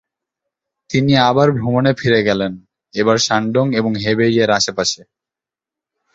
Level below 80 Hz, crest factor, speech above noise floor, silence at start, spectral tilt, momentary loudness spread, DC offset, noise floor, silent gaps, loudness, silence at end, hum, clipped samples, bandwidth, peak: -50 dBFS; 16 dB; 73 dB; 0.9 s; -5 dB/octave; 7 LU; under 0.1%; -88 dBFS; none; -15 LUFS; 1.2 s; none; under 0.1%; 8 kHz; 0 dBFS